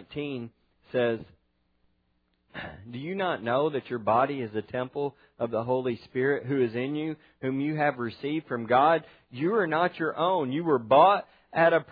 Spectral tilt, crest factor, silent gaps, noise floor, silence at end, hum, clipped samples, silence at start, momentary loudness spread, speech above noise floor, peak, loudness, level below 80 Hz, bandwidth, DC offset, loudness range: -9.5 dB/octave; 20 dB; none; -72 dBFS; 0 s; none; under 0.1%; 0 s; 14 LU; 45 dB; -6 dBFS; -27 LUFS; -68 dBFS; 5 kHz; under 0.1%; 7 LU